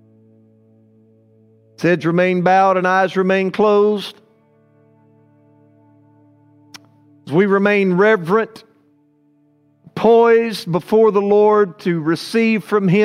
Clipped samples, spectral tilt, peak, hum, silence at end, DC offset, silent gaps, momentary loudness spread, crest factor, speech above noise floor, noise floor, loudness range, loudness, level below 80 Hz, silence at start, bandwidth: under 0.1%; -7 dB/octave; 0 dBFS; none; 0 s; under 0.1%; none; 8 LU; 16 dB; 42 dB; -57 dBFS; 7 LU; -15 LUFS; -66 dBFS; 1.8 s; 13 kHz